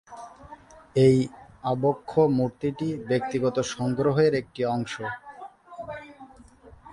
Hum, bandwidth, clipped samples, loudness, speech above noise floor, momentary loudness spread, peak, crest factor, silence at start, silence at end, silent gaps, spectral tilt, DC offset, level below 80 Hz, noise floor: none; 11 kHz; under 0.1%; -25 LUFS; 27 dB; 22 LU; -8 dBFS; 18 dB; 0.1 s; 0 s; none; -7 dB/octave; under 0.1%; -56 dBFS; -51 dBFS